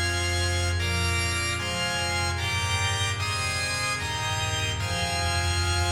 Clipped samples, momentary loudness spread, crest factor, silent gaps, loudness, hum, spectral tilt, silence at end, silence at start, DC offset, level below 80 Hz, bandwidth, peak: under 0.1%; 2 LU; 14 dB; none; -26 LUFS; none; -3 dB/octave; 0 s; 0 s; under 0.1%; -40 dBFS; 16 kHz; -14 dBFS